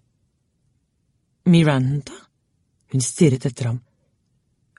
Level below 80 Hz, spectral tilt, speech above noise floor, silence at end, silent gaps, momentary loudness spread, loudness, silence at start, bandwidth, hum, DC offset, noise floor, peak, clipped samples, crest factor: -56 dBFS; -6 dB/octave; 50 dB; 1 s; none; 12 LU; -20 LUFS; 1.45 s; 11.5 kHz; none; under 0.1%; -68 dBFS; -4 dBFS; under 0.1%; 20 dB